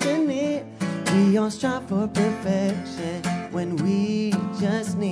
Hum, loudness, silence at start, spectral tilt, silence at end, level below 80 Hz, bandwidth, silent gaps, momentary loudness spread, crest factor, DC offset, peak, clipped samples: none; -24 LUFS; 0 s; -6 dB/octave; 0 s; -60 dBFS; 11 kHz; none; 8 LU; 14 dB; under 0.1%; -8 dBFS; under 0.1%